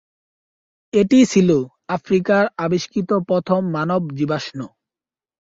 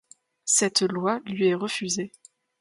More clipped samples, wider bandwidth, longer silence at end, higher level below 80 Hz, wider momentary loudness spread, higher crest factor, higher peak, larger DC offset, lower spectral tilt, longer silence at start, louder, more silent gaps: neither; second, 7.8 kHz vs 11.5 kHz; first, 0.9 s vs 0.5 s; first, -58 dBFS vs -72 dBFS; about the same, 12 LU vs 10 LU; about the same, 16 dB vs 20 dB; about the same, -4 dBFS vs -6 dBFS; neither; first, -6.5 dB/octave vs -3 dB/octave; first, 0.95 s vs 0.45 s; first, -18 LUFS vs -24 LUFS; neither